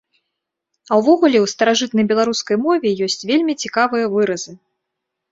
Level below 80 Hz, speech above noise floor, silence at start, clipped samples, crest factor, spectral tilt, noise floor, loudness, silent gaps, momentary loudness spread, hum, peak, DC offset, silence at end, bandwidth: -64 dBFS; 62 dB; 0.9 s; under 0.1%; 16 dB; -4 dB/octave; -79 dBFS; -17 LUFS; none; 7 LU; none; -2 dBFS; under 0.1%; 0.75 s; 8 kHz